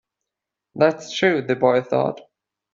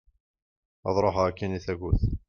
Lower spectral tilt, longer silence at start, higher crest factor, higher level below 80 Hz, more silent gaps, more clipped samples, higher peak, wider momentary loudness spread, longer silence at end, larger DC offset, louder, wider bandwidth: second, -5.5 dB/octave vs -7.5 dB/octave; about the same, 0.75 s vs 0.85 s; about the same, 20 dB vs 18 dB; second, -64 dBFS vs -36 dBFS; neither; neither; first, -2 dBFS vs -10 dBFS; first, 11 LU vs 8 LU; first, 0.55 s vs 0.1 s; neither; first, -20 LUFS vs -28 LUFS; first, 7.6 kHz vs 6.8 kHz